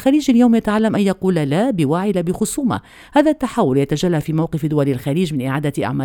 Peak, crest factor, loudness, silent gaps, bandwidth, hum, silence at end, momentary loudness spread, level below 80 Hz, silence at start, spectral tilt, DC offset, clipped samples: 0 dBFS; 16 dB; -17 LUFS; none; 18 kHz; none; 0 s; 6 LU; -46 dBFS; 0 s; -6.5 dB/octave; under 0.1%; under 0.1%